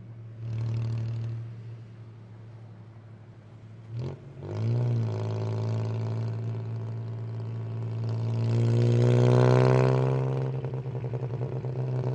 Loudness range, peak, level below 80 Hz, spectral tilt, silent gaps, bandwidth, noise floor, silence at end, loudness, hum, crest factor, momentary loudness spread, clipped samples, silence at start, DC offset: 14 LU; -8 dBFS; -58 dBFS; -8.5 dB/octave; none; 7.6 kHz; -48 dBFS; 0 s; -28 LUFS; none; 20 dB; 25 LU; under 0.1%; 0 s; under 0.1%